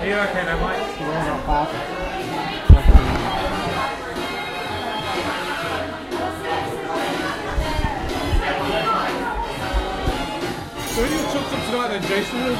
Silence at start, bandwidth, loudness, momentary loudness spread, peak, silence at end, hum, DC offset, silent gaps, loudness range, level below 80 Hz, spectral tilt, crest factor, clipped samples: 0 s; 16 kHz; -22 LUFS; 6 LU; 0 dBFS; 0 s; none; under 0.1%; none; 5 LU; -24 dBFS; -5.5 dB/octave; 20 dB; under 0.1%